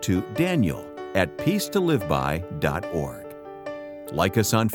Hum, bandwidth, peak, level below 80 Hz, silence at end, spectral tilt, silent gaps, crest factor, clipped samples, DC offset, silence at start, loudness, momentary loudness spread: none; 18 kHz; -4 dBFS; -46 dBFS; 0 s; -5.5 dB/octave; none; 20 dB; under 0.1%; under 0.1%; 0 s; -25 LUFS; 14 LU